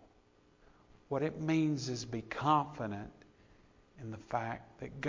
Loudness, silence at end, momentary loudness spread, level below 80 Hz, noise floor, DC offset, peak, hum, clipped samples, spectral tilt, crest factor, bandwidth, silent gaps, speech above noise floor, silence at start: -36 LUFS; 0 s; 16 LU; -64 dBFS; -67 dBFS; under 0.1%; -16 dBFS; none; under 0.1%; -6 dB/octave; 22 dB; 7.6 kHz; none; 31 dB; 0 s